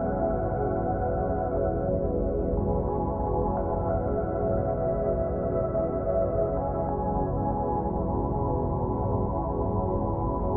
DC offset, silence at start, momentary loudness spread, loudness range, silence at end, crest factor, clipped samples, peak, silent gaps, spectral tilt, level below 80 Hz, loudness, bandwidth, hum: under 0.1%; 0 s; 1 LU; 1 LU; 0 s; 12 dB; under 0.1%; -14 dBFS; none; -13.5 dB/octave; -34 dBFS; -28 LUFS; 2.4 kHz; none